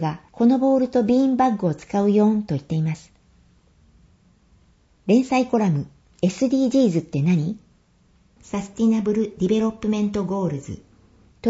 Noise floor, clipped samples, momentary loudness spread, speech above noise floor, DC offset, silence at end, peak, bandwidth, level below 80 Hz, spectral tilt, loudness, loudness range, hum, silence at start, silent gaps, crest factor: -58 dBFS; under 0.1%; 12 LU; 38 dB; under 0.1%; 0 s; -6 dBFS; 8 kHz; -54 dBFS; -7.5 dB/octave; -21 LUFS; 5 LU; none; 0 s; none; 16 dB